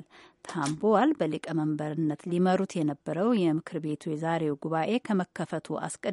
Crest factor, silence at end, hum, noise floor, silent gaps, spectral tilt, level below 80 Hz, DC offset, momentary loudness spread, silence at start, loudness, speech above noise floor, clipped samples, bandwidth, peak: 18 dB; 0 s; none; -48 dBFS; none; -6.5 dB/octave; -74 dBFS; under 0.1%; 9 LU; 0.45 s; -29 LUFS; 20 dB; under 0.1%; 11.5 kHz; -10 dBFS